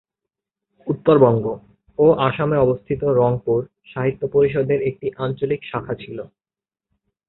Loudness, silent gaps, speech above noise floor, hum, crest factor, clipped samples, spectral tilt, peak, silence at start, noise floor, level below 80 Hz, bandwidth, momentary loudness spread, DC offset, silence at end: -19 LUFS; none; over 71 dB; none; 18 dB; under 0.1%; -12.5 dB/octave; -2 dBFS; 0.85 s; under -90 dBFS; -50 dBFS; 4.1 kHz; 17 LU; under 0.1%; 1.05 s